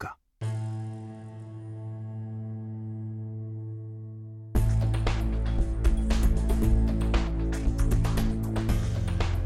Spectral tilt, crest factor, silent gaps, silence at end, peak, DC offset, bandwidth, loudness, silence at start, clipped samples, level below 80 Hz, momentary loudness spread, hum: -7 dB/octave; 16 dB; none; 0 s; -12 dBFS; under 0.1%; 13.5 kHz; -30 LUFS; 0 s; under 0.1%; -30 dBFS; 14 LU; none